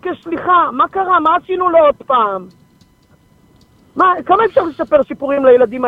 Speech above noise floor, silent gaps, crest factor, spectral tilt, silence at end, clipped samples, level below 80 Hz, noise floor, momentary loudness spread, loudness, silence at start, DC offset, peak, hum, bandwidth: 38 dB; none; 14 dB; -7 dB/octave; 0 s; under 0.1%; -52 dBFS; -51 dBFS; 8 LU; -13 LUFS; 0.05 s; under 0.1%; 0 dBFS; none; 5 kHz